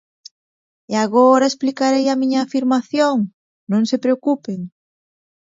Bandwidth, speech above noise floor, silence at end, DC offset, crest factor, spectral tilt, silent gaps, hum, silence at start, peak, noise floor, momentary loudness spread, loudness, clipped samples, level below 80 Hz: 7.8 kHz; over 73 dB; 0.75 s; under 0.1%; 16 dB; -5 dB/octave; 3.34-3.67 s; none; 0.9 s; -2 dBFS; under -90 dBFS; 11 LU; -17 LUFS; under 0.1%; -70 dBFS